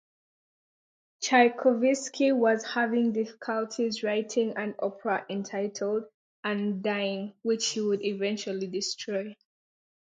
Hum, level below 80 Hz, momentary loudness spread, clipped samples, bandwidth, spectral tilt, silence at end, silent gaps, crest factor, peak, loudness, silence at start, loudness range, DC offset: none; -82 dBFS; 9 LU; under 0.1%; 9.4 kHz; -4 dB/octave; 0.85 s; 6.14-6.43 s; 22 dB; -8 dBFS; -28 LUFS; 1.2 s; 5 LU; under 0.1%